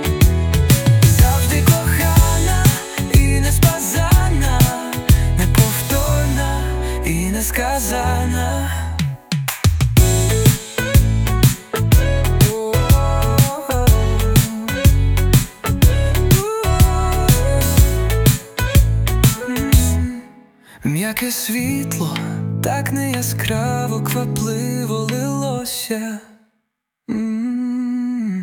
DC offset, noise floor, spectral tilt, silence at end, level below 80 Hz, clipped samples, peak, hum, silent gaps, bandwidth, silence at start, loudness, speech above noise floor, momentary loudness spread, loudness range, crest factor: under 0.1%; -74 dBFS; -5 dB/octave; 0 s; -22 dBFS; under 0.1%; 0 dBFS; none; none; 19.5 kHz; 0 s; -17 LUFS; 54 dB; 8 LU; 6 LU; 16 dB